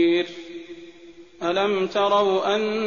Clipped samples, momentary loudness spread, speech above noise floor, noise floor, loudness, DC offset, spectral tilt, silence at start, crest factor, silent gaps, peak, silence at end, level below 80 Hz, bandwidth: under 0.1%; 19 LU; 25 dB; -46 dBFS; -22 LUFS; 0.2%; -2.5 dB/octave; 0 s; 16 dB; none; -8 dBFS; 0 s; -66 dBFS; 7.2 kHz